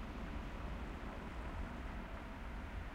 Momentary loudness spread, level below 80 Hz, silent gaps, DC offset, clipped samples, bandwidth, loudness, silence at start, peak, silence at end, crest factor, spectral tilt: 2 LU; -48 dBFS; none; under 0.1%; under 0.1%; 15.5 kHz; -48 LUFS; 0 s; -32 dBFS; 0 s; 14 dB; -6.5 dB/octave